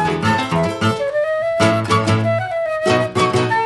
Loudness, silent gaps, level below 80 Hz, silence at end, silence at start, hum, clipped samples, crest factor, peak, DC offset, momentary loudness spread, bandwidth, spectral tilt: -17 LUFS; none; -48 dBFS; 0 s; 0 s; none; under 0.1%; 16 dB; -2 dBFS; under 0.1%; 3 LU; 12 kHz; -5.5 dB/octave